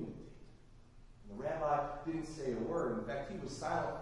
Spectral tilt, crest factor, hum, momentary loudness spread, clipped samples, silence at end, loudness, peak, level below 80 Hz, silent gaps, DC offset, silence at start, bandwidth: -6 dB/octave; 18 dB; none; 13 LU; under 0.1%; 0 s; -39 LUFS; -22 dBFS; -56 dBFS; none; under 0.1%; 0 s; 11.5 kHz